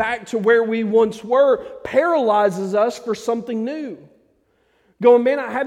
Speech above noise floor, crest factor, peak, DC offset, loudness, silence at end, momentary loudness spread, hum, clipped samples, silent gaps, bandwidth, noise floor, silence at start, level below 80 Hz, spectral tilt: 44 dB; 18 dB; -2 dBFS; under 0.1%; -18 LUFS; 0 s; 10 LU; none; under 0.1%; none; 12 kHz; -62 dBFS; 0 s; -62 dBFS; -5.5 dB/octave